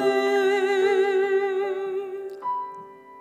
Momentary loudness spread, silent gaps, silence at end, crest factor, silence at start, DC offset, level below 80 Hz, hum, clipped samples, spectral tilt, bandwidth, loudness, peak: 12 LU; none; 0 s; 14 dB; 0 s; under 0.1%; -84 dBFS; none; under 0.1%; -3.5 dB/octave; 9.8 kHz; -24 LUFS; -10 dBFS